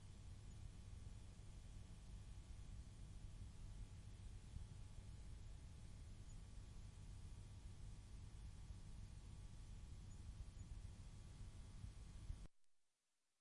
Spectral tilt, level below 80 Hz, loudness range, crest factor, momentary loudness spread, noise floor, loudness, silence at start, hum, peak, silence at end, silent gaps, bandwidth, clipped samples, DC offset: -5.5 dB/octave; -58 dBFS; 1 LU; 18 dB; 2 LU; -90 dBFS; -60 LUFS; 0 s; none; -38 dBFS; 0.55 s; none; 11.5 kHz; under 0.1%; under 0.1%